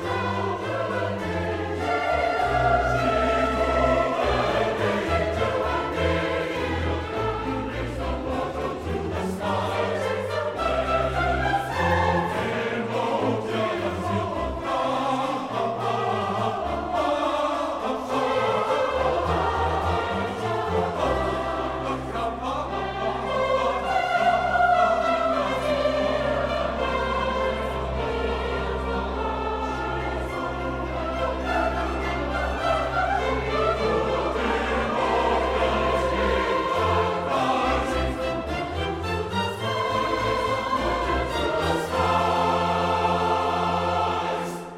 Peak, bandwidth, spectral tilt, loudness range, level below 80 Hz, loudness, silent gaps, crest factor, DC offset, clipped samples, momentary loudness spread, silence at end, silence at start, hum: -8 dBFS; 15.5 kHz; -5.5 dB/octave; 4 LU; -38 dBFS; -25 LUFS; none; 16 dB; under 0.1%; under 0.1%; 6 LU; 0 s; 0 s; none